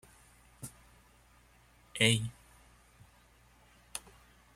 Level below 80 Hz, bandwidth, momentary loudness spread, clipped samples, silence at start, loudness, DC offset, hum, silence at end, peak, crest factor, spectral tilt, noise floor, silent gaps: -64 dBFS; 16 kHz; 22 LU; under 0.1%; 0.6 s; -32 LUFS; under 0.1%; 60 Hz at -60 dBFS; 0.55 s; -12 dBFS; 28 dB; -3.5 dB/octave; -63 dBFS; none